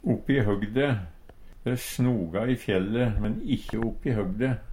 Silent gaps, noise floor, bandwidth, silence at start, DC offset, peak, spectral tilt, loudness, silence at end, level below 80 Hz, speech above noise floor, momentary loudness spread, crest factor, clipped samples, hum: none; -46 dBFS; 16 kHz; 0.05 s; under 0.1%; -10 dBFS; -7 dB/octave; -28 LUFS; 0 s; -40 dBFS; 20 dB; 6 LU; 16 dB; under 0.1%; none